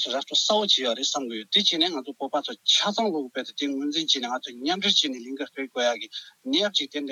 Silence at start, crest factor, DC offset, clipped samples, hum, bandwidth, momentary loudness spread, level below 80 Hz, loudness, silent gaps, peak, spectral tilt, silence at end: 0 s; 18 dB; under 0.1%; under 0.1%; none; 14.5 kHz; 12 LU; -80 dBFS; -24 LUFS; none; -8 dBFS; -2 dB/octave; 0 s